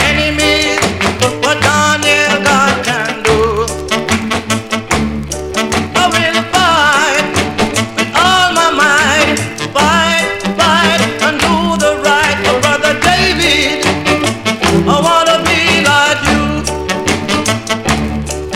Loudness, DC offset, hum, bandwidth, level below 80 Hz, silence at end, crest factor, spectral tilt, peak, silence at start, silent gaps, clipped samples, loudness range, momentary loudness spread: -11 LUFS; under 0.1%; none; 17 kHz; -30 dBFS; 0 s; 12 dB; -3 dB/octave; 0 dBFS; 0 s; none; under 0.1%; 3 LU; 7 LU